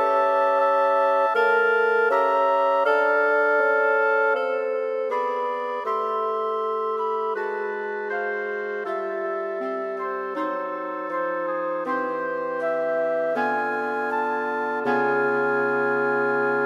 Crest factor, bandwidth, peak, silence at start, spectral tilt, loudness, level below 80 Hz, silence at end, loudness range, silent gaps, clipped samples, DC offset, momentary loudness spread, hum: 14 dB; 11.5 kHz; -8 dBFS; 0 s; -5.5 dB/octave; -23 LUFS; -78 dBFS; 0 s; 8 LU; none; under 0.1%; under 0.1%; 8 LU; none